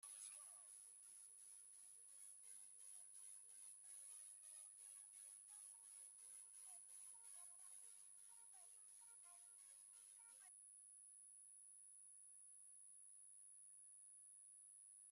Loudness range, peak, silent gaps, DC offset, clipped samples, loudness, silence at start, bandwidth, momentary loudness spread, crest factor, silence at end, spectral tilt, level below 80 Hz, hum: 3 LU; -46 dBFS; none; under 0.1%; under 0.1%; -60 LUFS; 0 s; 14 kHz; 4 LU; 16 dB; 0 s; 3 dB/octave; under -90 dBFS; none